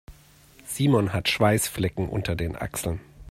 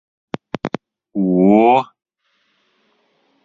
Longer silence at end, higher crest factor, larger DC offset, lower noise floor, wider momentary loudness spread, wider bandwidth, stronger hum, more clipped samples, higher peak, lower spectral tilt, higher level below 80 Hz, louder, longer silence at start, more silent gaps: second, 0 s vs 1.6 s; about the same, 20 dB vs 18 dB; neither; second, -53 dBFS vs -65 dBFS; second, 12 LU vs 20 LU; first, 16 kHz vs 7.2 kHz; neither; neither; second, -6 dBFS vs -2 dBFS; second, -5 dB/octave vs -9 dB/octave; first, -46 dBFS vs -60 dBFS; second, -25 LUFS vs -16 LUFS; second, 0.1 s vs 0.65 s; neither